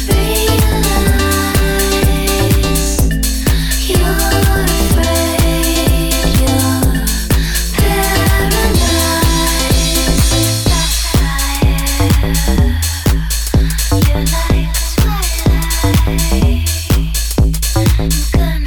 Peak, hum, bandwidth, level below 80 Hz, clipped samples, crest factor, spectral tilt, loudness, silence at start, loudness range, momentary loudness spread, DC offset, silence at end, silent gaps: 0 dBFS; none; 19.5 kHz; -16 dBFS; under 0.1%; 12 dB; -4.5 dB/octave; -13 LUFS; 0 s; 2 LU; 3 LU; under 0.1%; 0 s; none